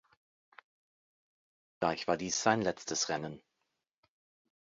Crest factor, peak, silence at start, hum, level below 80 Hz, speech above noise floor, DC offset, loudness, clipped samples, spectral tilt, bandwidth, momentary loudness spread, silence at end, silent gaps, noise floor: 28 dB; -10 dBFS; 1.8 s; none; -70 dBFS; 52 dB; under 0.1%; -33 LUFS; under 0.1%; -3 dB/octave; 7.6 kHz; 10 LU; 1.4 s; none; -85 dBFS